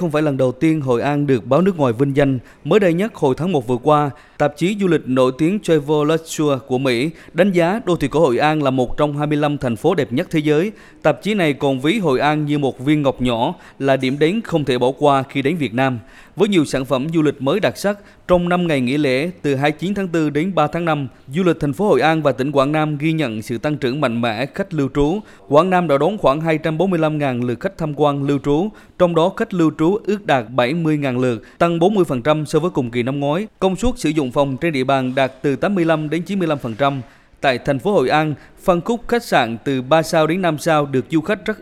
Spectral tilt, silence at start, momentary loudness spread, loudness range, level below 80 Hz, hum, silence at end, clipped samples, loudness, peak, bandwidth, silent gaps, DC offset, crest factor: -6.5 dB/octave; 0 s; 5 LU; 2 LU; -42 dBFS; none; 0 s; under 0.1%; -18 LUFS; 0 dBFS; 15 kHz; none; under 0.1%; 18 dB